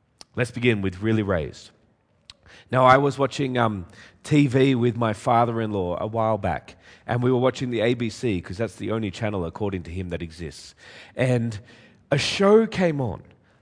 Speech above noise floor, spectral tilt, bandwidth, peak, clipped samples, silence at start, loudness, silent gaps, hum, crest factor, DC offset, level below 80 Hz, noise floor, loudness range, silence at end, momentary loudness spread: 40 dB; -6.5 dB/octave; 10.5 kHz; -2 dBFS; under 0.1%; 0.35 s; -23 LUFS; none; none; 22 dB; under 0.1%; -52 dBFS; -63 dBFS; 7 LU; 0.4 s; 17 LU